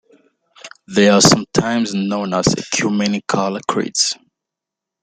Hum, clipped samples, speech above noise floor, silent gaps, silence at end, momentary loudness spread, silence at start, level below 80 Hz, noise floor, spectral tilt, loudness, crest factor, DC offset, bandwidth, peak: none; under 0.1%; 68 dB; none; 0.9 s; 9 LU; 0.65 s; -50 dBFS; -84 dBFS; -3.5 dB/octave; -16 LUFS; 18 dB; under 0.1%; 13.5 kHz; 0 dBFS